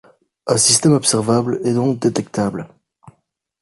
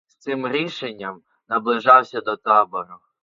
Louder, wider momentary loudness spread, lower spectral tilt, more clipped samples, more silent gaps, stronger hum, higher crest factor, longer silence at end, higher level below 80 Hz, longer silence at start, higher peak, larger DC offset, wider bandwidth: first, -16 LUFS vs -19 LUFS; second, 11 LU vs 18 LU; second, -4 dB/octave vs -5.5 dB/octave; neither; neither; neither; about the same, 18 dB vs 20 dB; first, 0.95 s vs 0.25 s; first, -54 dBFS vs -72 dBFS; first, 0.45 s vs 0.25 s; about the same, 0 dBFS vs 0 dBFS; neither; first, 12 kHz vs 7.4 kHz